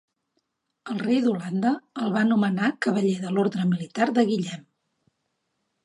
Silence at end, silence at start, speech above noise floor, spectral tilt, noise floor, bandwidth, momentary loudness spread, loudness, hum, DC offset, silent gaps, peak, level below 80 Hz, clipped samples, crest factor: 1.25 s; 0.85 s; 53 dB; -6.5 dB/octave; -77 dBFS; 11 kHz; 8 LU; -24 LUFS; none; under 0.1%; none; -8 dBFS; -74 dBFS; under 0.1%; 18 dB